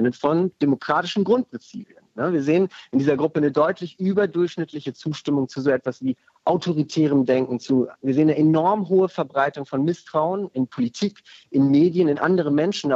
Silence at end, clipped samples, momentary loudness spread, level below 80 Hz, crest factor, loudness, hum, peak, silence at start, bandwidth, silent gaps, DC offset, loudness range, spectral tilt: 0 s; under 0.1%; 10 LU; -70 dBFS; 14 dB; -22 LUFS; none; -6 dBFS; 0 s; 7.8 kHz; none; under 0.1%; 3 LU; -7 dB/octave